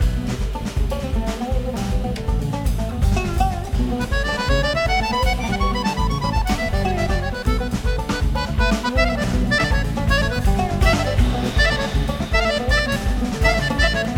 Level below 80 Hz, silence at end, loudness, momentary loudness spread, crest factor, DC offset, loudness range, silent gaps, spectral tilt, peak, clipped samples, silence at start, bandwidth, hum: -22 dBFS; 0 s; -21 LUFS; 6 LU; 16 dB; under 0.1%; 4 LU; none; -5.5 dB/octave; -4 dBFS; under 0.1%; 0 s; 16 kHz; none